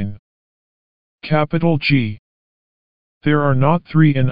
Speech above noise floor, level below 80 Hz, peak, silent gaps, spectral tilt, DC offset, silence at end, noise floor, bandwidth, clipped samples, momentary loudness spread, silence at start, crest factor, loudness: over 75 dB; -46 dBFS; -2 dBFS; 0.19-1.18 s, 2.19-3.21 s; -6.5 dB/octave; 3%; 0 s; under -90 dBFS; 5.2 kHz; under 0.1%; 13 LU; 0 s; 16 dB; -17 LUFS